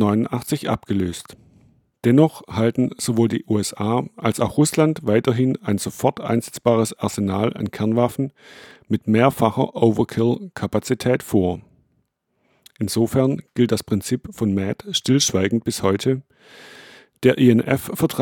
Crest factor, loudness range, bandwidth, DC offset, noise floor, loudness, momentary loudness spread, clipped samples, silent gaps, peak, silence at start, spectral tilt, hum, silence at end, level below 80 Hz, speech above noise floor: 20 dB; 3 LU; 19 kHz; under 0.1%; -69 dBFS; -20 LUFS; 7 LU; under 0.1%; none; -2 dBFS; 0 s; -5.5 dB/octave; none; 0 s; -54 dBFS; 49 dB